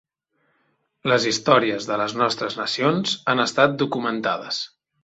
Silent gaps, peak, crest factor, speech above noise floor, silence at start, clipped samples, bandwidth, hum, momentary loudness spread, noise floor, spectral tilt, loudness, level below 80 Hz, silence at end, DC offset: none; -2 dBFS; 20 dB; 48 dB; 1.05 s; under 0.1%; 8.2 kHz; none; 8 LU; -70 dBFS; -4 dB/octave; -21 LUFS; -66 dBFS; 0.35 s; under 0.1%